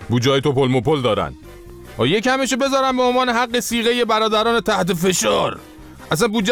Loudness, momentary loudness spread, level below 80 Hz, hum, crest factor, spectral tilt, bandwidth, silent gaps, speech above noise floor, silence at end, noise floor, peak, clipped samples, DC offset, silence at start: -18 LUFS; 6 LU; -44 dBFS; none; 14 dB; -4 dB/octave; 19.5 kHz; none; 20 dB; 0 s; -38 dBFS; -4 dBFS; under 0.1%; under 0.1%; 0 s